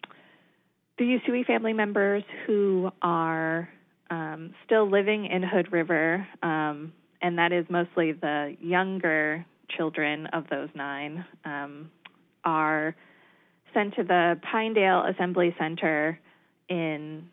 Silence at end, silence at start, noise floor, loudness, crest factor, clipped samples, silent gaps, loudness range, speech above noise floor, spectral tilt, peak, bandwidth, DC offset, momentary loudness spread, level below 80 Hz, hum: 0.05 s; 1 s; -69 dBFS; -27 LUFS; 18 dB; under 0.1%; none; 5 LU; 43 dB; -9.5 dB/octave; -10 dBFS; 4 kHz; under 0.1%; 13 LU; -86 dBFS; none